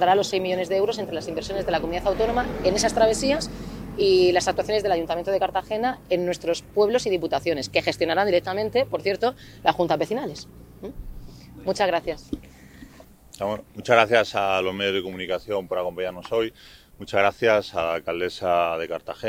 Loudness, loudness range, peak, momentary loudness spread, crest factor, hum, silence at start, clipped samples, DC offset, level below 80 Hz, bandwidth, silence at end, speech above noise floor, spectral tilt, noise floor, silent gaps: -24 LUFS; 5 LU; 0 dBFS; 12 LU; 24 dB; none; 0 s; under 0.1%; under 0.1%; -46 dBFS; 16 kHz; 0 s; 25 dB; -4 dB/octave; -48 dBFS; none